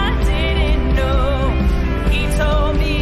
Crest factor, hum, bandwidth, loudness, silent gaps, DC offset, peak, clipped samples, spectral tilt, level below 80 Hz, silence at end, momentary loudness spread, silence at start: 8 dB; none; 13 kHz; -18 LUFS; none; under 0.1%; -8 dBFS; under 0.1%; -6.5 dB/octave; -18 dBFS; 0 s; 1 LU; 0 s